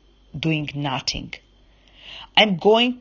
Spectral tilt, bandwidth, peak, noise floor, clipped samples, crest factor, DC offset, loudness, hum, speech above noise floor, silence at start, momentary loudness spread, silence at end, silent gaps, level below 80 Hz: -4.5 dB/octave; 7.4 kHz; 0 dBFS; -54 dBFS; under 0.1%; 22 dB; under 0.1%; -20 LUFS; none; 34 dB; 0.35 s; 23 LU; 0 s; none; -48 dBFS